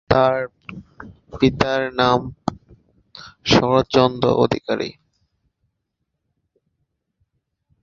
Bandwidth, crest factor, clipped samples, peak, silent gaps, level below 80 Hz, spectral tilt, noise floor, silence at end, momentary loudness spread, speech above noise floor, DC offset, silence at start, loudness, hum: 7.4 kHz; 22 dB; under 0.1%; 0 dBFS; none; -46 dBFS; -6 dB/octave; -76 dBFS; 2.9 s; 22 LU; 58 dB; under 0.1%; 0.1 s; -19 LUFS; none